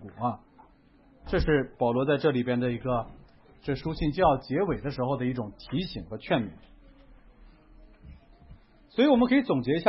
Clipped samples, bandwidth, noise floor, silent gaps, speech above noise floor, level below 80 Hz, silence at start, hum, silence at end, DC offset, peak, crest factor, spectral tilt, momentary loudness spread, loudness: under 0.1%; 5.8 kHz; -58 dBFS; none; 32 dB; -46 dBFS; 0 s; none; 0 s; under 0.1%; -10 dBFS; 20 dB; -10.5 dB/octave; 12 LU; -27 LUFS